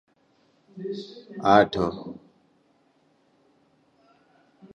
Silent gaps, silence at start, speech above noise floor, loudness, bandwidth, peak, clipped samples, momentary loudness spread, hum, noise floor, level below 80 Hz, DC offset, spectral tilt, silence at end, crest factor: none; 0.75 s; 41 dB; -24 LUFS; 10 kHz; -4 dBFS; under 0.1%; 23 LU; none; -65 dBFS; -58 dBFS; under 0.1%; -6.5 dB/octave; 2.6 s; 24 dB